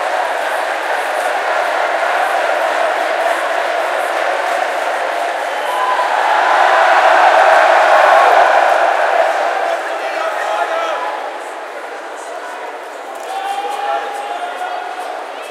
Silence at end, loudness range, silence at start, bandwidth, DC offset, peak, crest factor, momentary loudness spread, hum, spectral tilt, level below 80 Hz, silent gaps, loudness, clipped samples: 0 s; 13 LU; 0 s; 15.5 kHz; under 0.1%; 0 dBFS; 14 dB; 17 LU; none; 1 dB/octave; -82 dBFS; none; -14 LUFS; under 0.1%